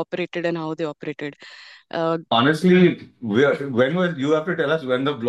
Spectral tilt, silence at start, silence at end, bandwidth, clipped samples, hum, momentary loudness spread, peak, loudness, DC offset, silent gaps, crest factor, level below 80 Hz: -7 dB/octave; 0 s; 0 s; 12 kHz; under 0.1%; none; 15 LU; -4 dBFS; -21 LUFS; under 0.1%; none; 18 dB; -66 dBFS